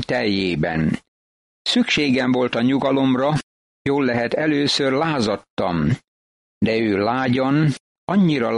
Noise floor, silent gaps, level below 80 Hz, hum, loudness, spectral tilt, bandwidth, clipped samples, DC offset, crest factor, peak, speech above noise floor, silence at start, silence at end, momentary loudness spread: under -90 dBFS; 1.08-1.65 s, 3.43-3.85 s, 5.50-5.57 s, 6.08-6.61 s, 7.80-8.07 s; -48 dBFS; none; -20 LUFS; -6 dB/octave; 11 kHz; under 0.1%; under 0.1%; 14 dB; -6 dBFS; over 71 dB; 0 s; 0 s; 6 LU